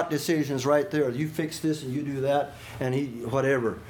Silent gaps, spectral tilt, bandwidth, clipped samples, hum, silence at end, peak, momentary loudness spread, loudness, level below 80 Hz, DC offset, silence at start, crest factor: none; -6 dB/octave; 19 kHz; under 0.1%; none; 0 s; -10 dBFS; 6 LU; -27 LUFS; -58 dBFS; under 0.1%; 0 s; 18 dB